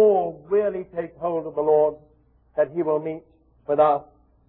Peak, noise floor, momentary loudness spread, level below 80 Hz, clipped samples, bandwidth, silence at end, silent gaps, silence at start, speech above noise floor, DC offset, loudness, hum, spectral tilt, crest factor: -6 dBFS; -59 dBFS; 13 LU; -60 dBFS; under 0.1%; 4 kHz; 0.45 s; none; 0 s; 36 dB; under 0.1%; -23 LUFS; none; -11 dB/octave; 16 dB